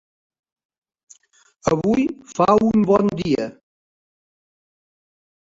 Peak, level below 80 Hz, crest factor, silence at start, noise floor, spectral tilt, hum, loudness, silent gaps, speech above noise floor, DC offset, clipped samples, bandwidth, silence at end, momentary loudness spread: -2 dBFS; -52 dBFS; 20 dB; 1.65 s; -58 dBFS; -7 dB/octave; none; -19 LUFS; none; 41 dB; under 0.1%; under 0.1%; 7.8 kHz; 2.1 s; 9 LU